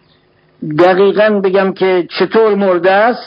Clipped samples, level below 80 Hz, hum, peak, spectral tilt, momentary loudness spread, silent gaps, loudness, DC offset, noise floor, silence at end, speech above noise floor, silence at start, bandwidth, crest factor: 0.1%; -60 dBFS; none; 0 dBFS; -8 dB/octave; 5 LU; none; -11 LUFS; under 0.1%; -51 dBFS; 0 s; 41 dB; 0.6 s; 5.4 kHz; 12 dB